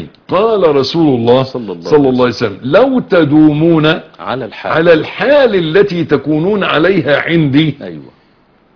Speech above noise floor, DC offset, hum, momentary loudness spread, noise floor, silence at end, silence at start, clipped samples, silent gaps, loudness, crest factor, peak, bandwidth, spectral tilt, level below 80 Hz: 39 dB; under 0.1%; none; 10 LU; -50 dBFS; 0.7 s; 0 s; 0.3%; none; -11 LUFS; 10 dB; 0 dBFS; 5.4 kHz; -7.5 dB/octave; -44 dBFS